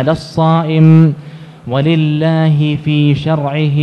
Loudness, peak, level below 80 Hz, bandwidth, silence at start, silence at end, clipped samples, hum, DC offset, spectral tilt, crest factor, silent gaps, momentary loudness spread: -12 LUFS; 0 dBFS; -46 dBFS; 6 kHz; 0 s; 0 s; 0.7%; none; under 0.1%; -8.5 dB/octave; 12 dB; none; 8 LU